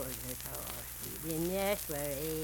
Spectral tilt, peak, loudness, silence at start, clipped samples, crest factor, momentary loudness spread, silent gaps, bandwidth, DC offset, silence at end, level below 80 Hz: -4 dB/octave; -16 dBFS; -37 LUFS; 0 s; under 0.1%; 22 dB; 7 LU; none; 19 kHz; under 0.1%; 0 s; -52 dBFS